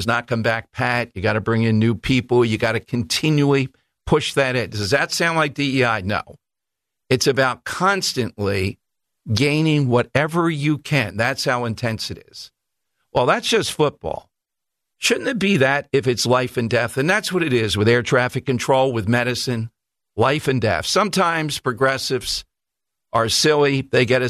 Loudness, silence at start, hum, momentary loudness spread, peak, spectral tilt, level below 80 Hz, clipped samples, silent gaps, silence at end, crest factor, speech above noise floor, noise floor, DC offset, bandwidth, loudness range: -19 LUFS; 0 s; none; 8 LU; -4 dBFS; -4.5 dB/octave; -48 dBFS; under 0.1%; none; 0 s; 16 dB; 66 dB; -85 dBFS; under 0.1%; 14.5 kHz; 3 LU